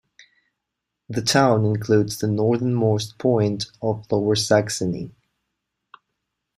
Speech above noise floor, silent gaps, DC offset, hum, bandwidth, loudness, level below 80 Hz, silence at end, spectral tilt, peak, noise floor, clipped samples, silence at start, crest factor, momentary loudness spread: 61 dB; none; under 0.1%; none; 15.5 kHz; -21 LUFS; -58 dBFS; 1.45 s; -5.5 dB/octave; -4 dBFS; -82 dBFS; under 0.1%; 1.1 s; 18 dB; 9 LU